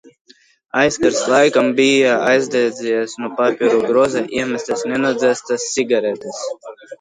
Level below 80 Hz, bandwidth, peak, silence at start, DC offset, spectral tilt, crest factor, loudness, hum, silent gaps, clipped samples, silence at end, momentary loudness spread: -58 dBFS; 10.5 kHz; 0 dBFS; 0.75 s; under 0.1%; -3.5 dB/octave; 16 dB; -17 LUFS; none; none; under 0.1%; 0.05 s; 11 LU